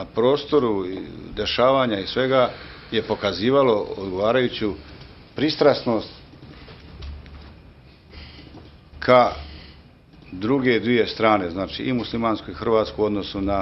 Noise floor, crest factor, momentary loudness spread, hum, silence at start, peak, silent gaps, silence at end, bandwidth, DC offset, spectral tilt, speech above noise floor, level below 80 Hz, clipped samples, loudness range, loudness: -48 dBFS; 22 dB; 22 LU; none; 0 s; -2 dBFS; none; 0 s; 6.2 kHz; under 0.1%; -7 dB/octave; 27 dB; -46 dBFS; under 0.1%; 5 LU; -21 LUFS